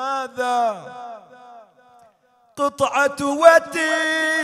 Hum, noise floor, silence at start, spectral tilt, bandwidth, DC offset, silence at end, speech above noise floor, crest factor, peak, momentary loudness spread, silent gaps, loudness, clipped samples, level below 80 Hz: none; -58 dBFS; 0 s; -2.5 dB/octave; 14 kHz; under 0.1%; 0 s; 40 dB; 20 dB; 0 dBFS; 20 LU; none; -18 LUFS; under 0.1%; -64 dBFS